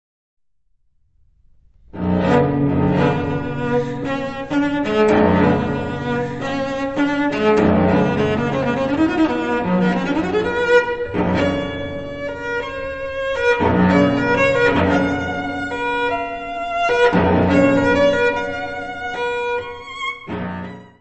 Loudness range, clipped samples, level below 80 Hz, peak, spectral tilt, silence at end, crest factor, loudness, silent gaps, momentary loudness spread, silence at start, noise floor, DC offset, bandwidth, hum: 3 LU; under 0.1%; -42 dBFS; -2 dBFS; -7 dB/octave; 0.15 s; 16 dB; -18 LUFS; none; 11 LU; 1.95 s; -66 dBFS; under 0.1%; 8.2 kHz; none